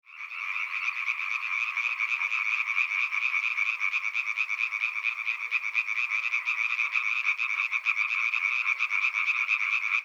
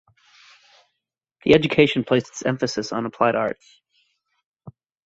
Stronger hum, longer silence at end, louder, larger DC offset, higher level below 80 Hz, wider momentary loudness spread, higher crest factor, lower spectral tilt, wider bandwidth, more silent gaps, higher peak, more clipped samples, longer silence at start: neither; second, 0 s vs 0.35 s; second, -26 LUFS vs -21 LUFS; neither; second, under -90 dBFS vs -54 dBFS; second, 4 LU vs 11 LU; about the same, 18 dB vs 22 dB; second, 8 dB/octave vs -5.5 dB/octave; first, over 20 kHz vs 8 kHz; second, none vs 4.46-4.54 s; second, -12 dBFS vs -2 dBFS; neither; second, 0.1 s vs 1.45 s